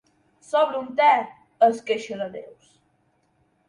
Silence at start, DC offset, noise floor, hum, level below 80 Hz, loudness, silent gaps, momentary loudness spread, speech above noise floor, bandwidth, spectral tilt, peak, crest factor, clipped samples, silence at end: 0.5 s; under 0.1%; -67 dBFS; none; -74 dBFS; -22 LUFS; none; 15 LU; 45 dB; 11 kHz; -4 dB/octave; -6 dBFS; 18 dB; under 0.1%; 1.25 s